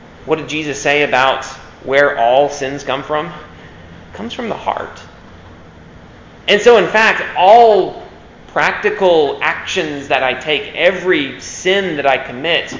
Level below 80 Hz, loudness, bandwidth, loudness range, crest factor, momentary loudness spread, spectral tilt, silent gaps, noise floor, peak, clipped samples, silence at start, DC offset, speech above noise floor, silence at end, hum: -46 dBFS; -14 LUFS; 7.6 kHz; 12 LU; 14 dB; 14 LU; -3.5 dB/octave; none; -38 dBFS; 0 dBFS; 0.2%; 0 s; under 0.1%; 24 dB; 0 s; none